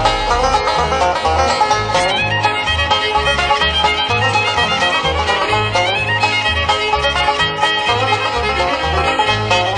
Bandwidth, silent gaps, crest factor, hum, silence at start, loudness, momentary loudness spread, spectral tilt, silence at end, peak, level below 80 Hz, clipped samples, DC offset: 10 kHz; none; 14 dB; none; 0 s; -14 LUFS; 2 LU; -3 dB/octave; 0 s; -2 dBFS; -30 dBFS; under 0.1%; under 0.1%